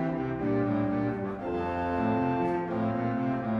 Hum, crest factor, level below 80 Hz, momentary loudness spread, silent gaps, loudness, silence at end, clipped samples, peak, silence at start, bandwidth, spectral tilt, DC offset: none; 12 dB; -52 dBFS; 4 LU; none; -29 LUFS; 0 s; under 0.1%; -16 dBFS; 0 s; 6.4 kHz; -9.5 dB/octave; under 0.1%